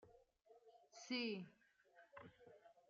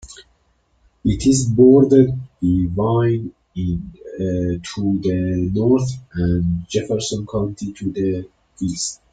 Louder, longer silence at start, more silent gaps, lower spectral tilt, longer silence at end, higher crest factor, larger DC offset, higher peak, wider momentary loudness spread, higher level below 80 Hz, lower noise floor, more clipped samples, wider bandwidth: second, -47 LUFS vs -19 LUFS; about the same, 0 s vs 0.05 s; neither; second, -2.5 dB/octave vs -6.5 dB/octave; about the same, 0.1 s vs 0.2 s; about the same, 22 dB vs 18 dB; neither; second, -32 dBFS vs -2 dBFS; first, 23 LU vs 13 LU; second, under -90 dBFS vs -40 dBFS; first, -72 dBFS vs -62 dBFS; neither; second, 7.4 kHz vs 9.4 kHz